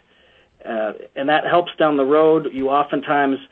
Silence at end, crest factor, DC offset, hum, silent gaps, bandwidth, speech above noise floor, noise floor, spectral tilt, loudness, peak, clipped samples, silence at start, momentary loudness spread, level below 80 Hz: 0.05 s; 14 dB; under 0.1%; none; none; 4.2 kHz; 37 dB; -55 dBFS; -8.5 dB/octave; -18 LUFS; -4 dBFS; under 0.1%; 0.65 s; 11 LU; -60 dBFS